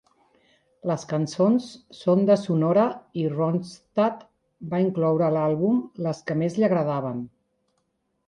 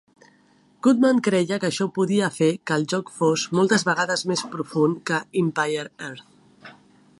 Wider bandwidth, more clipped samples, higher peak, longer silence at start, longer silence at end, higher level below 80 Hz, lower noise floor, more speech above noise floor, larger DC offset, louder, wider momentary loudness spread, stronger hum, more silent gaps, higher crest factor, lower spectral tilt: about the same, 10.5 kHz vs 11.5 kHz; neither; about the same, -8 dBFS vs -6 dBFS; about the same, 0.85 s vs 0.85 s; first, 1 s vs 0.5 s; about the same, -66 dBFS vs -70 dBFS; first, -74 dBFS vs -58 dBFS; first, 50 dB vs 36 dB; neither; about the same, -24 LUFS vs -22 LUFS; about the same, 10 LU vs 9 LU; neither; neither; about the same, 16 dB vs 16 dB; first, -8 dB/octave vs -5 dB/octave